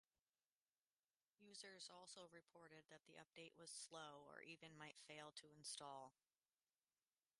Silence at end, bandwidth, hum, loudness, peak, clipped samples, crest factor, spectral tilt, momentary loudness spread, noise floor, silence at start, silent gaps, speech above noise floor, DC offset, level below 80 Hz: 1.3 s; 11.5 kHz; none; -60 LUFS; -42 dBFS; under 0.1%; 22 dB; -2 dB/octave; 11 LU; under -90 dBFS; 1.4 s; none; over 28 dB; under 0.1%; under -90 dBFS